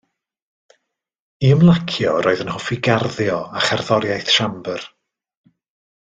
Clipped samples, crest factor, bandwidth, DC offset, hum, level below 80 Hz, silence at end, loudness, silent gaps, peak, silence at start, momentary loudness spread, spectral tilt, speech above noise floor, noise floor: under 0.1%; 18 dB; 8.8 kHz; under 0.1%; none; -52 dBFS; 1.15 s; -18 LUFS; none; 0 dBFS; 1.4 s; 12 LU; -5.5 dB/octave; 54 dB; -71 dBFS